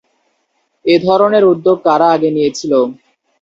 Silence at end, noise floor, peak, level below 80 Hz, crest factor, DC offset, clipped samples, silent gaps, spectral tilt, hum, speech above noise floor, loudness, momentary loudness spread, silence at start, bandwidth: 0.5 s; -64 dBFS; 0 dBFS; -58 dBFS; 14 dB; under 0.1%; under 0.1%; none; -5.5 dB/octave; none; 53 dB; -12 LUFS; 6 LU; 0.85 s; 7.8 kHz